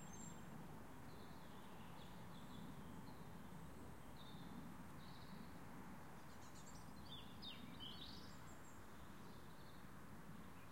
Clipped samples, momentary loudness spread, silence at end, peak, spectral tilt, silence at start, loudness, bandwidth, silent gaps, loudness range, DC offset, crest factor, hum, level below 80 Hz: under 0.1%; 5 LU; 0 s; -42 dBFS; -4.5 dB/octave; 0 s; -58 LUFS; 16.5 kHz; none; 2 LU; 0.1%; 14 dB; none; -70 dBFS